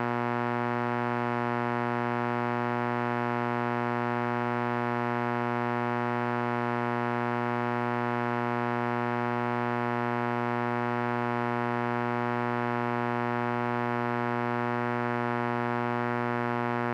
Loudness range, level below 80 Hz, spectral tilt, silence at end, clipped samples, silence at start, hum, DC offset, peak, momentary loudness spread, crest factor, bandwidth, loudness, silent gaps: 0 LU; -72 dBFS; -8 dB/octave; 0 s; under 0.1%; 0 s; none; under 0.1%; -14 dBFS; 0 LU; 16 dB; 8.4 kHz; -29 LUFS; none